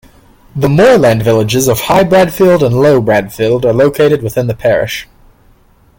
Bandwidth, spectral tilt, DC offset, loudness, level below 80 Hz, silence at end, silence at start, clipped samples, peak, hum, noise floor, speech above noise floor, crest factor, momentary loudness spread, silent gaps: 17 kHz; -6 dB/octave; under 0.1%; -10 LUFS; -38 dBFS; 0.95 s; 0.55 s; under 0.1%; 0 dBFS; none; -46 dBFS; 37 dB; 10 dB; 7 LU; none